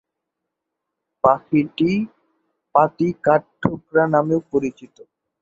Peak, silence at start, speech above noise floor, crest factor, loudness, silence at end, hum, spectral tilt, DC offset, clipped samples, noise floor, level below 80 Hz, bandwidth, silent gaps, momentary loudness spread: -2 dBFS; 1.25 s; 62 dB; 20 dB; -20 LUFS; 0.55 s; none; -8 dB/octave; under 0.1%; under 0.1%; -81 dBFS; -56 dBFS; 7.6 kHz; none; 8 LU